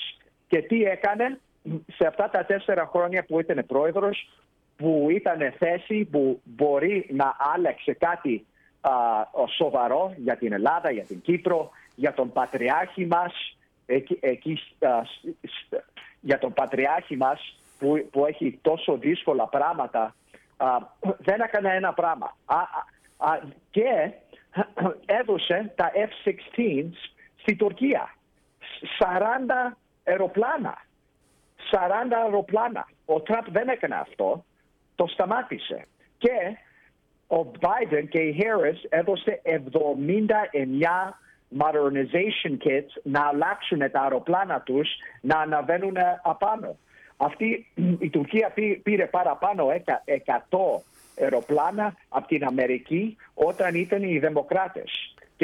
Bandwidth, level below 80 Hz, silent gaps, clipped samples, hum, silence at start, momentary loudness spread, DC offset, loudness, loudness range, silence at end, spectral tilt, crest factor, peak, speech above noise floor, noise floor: 11.5 kHz; -66 dBFS; none; under 0.1%; none; 0 s; 9 LU; under 0.1%; -25 LUFS; 3 LU; 0 s; -7 dB/octave; 16 dB; -10 dBFS; 41 dB; -65 dBFS